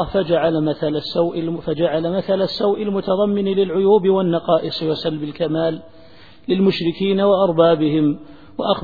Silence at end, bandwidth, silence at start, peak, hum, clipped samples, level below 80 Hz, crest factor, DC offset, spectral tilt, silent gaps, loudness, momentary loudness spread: 0 s; 5 kHz; 0 s; -2 dBFS; none; under 0.1%; -50 dBFS; 16 dB; 0.5%; -9 dB/octave; none; -18 LUFS; 9 LU